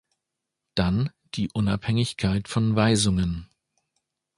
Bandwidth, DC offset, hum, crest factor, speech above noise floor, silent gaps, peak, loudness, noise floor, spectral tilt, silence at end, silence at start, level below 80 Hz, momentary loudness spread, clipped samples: 11.5 kHz; under 0.1%; none; 20 dB; 61 dB; none; -6 dBFS; -25 LUFS; -84 dBFS; -5.5 dB/octave; 0.9 s; 0.75 s; -42 dBFS; 10 LU; under 0.1%